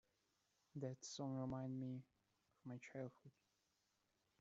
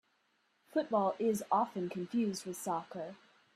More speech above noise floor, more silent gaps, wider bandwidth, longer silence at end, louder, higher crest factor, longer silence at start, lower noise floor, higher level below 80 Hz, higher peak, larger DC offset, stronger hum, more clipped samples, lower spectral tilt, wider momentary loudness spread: second, 36 dB vs 41 dB; neither; second, 7.6 kHz vs 15 kHz; first, 1.1 s vs 0.4 s; second, -51 LUFS vs -35 LUFS; about the same, 18 dB vs 18 dB; about the same, 0.75 s vs 0.75 s; first, -86 dBFS vs -76 dBFS; about the same, -82 dBFS vs -82 dBFS; second, -34 dBFS vs -18 dBFS; neither; neither; neither; first, -7 dB/octave vs -5.5 dB/octave; about the same, 10 LU vs 10 LU